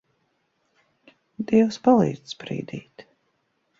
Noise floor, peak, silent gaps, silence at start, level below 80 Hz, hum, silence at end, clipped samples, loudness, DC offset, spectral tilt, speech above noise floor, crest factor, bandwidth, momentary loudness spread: -71 dBFS; -6 dBFS; none; 1.4 s; -64 dBFS; none; 0.8 s; under 0.1%; -22 LUFS; under 0.1%; -7 dB/octave; 50 dB; 20 dB; 7.6 kHz; 17 LU